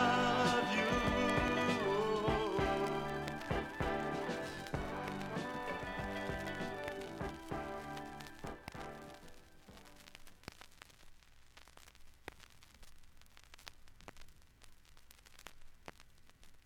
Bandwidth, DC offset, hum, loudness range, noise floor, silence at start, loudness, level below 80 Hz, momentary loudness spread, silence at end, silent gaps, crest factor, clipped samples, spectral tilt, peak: 17 kHz; under 0.1%; none; 24 LU; -60 dBFS; 0 s; -38 LUFS; -54 dBFS; 24 LU; 0.05 s; none; 20 dB; under 0.1%; -5 dB/octave; -20 dBFS